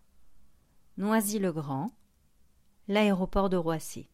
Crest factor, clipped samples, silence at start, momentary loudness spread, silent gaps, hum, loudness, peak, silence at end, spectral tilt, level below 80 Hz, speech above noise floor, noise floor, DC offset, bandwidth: 18 dB; under 0.1%; 0.25 s; 12 LU; none; none; -29 LUFS; -14 dBFS; 0.1 s; -5.5 dB/octave; -48 dBFS; 36 dB; -65 dBFS; under 0.1%; 16 kHz